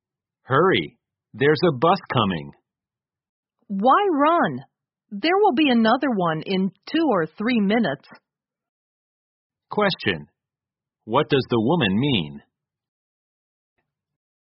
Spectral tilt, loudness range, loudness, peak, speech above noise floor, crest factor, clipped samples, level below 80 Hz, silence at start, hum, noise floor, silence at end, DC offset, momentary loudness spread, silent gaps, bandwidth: -4 dB/octave; 5 LU; -21 LUFS; -4 dBFS; over 70 dB; 18 dB; under 0.1%; -60 dBFS; 0.5 s; none; under -90 dBFS; 2.1 s; under 0.1%; 10 LU; 3.29-3.43 s, 8.69-9.50 s; 5.8 kHz